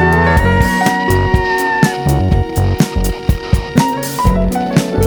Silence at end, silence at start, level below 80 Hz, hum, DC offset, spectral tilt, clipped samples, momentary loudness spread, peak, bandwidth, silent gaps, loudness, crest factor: 0 s; 0 s; -20 dBFS; none; under 0.1%; -6 dB/octave; under 0.1%; 5 LU; 0 dBFS; over 20 kHz; none; -14 LUFS; 12 dB